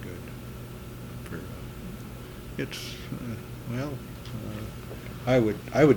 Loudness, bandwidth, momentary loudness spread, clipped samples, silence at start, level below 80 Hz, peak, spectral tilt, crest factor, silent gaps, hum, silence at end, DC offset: -33 LUFS; 19 kHz; 16 LU; under 0.1%; 0 s; -48 dBFS; -6 dBFS; -6.5 dB/octave; 24 dB; none; none; 0 s; under 0.1%